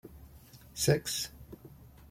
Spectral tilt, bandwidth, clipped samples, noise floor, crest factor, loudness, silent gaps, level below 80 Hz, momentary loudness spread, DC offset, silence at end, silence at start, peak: -4 dB/octave; 16.5 kHz; under 0.1%; -55 dBFS; 24 dB; -31 LUFS; none; -56 dBFS; 25 LU; under 0.1%; 0.05 s; 0.05 s; -12 dBFS